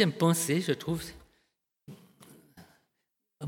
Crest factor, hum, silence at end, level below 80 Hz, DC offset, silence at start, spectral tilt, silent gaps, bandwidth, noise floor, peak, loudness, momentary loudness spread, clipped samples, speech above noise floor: 22 dB; none; 0 s; -62 dBFS; under 0.1%; 0 s; -5 dB/octave; none; 17.5 kHz; -82 dBFS; -10 dBFS; -29 LUFS; 27 LU; under 0.1%; 54 dB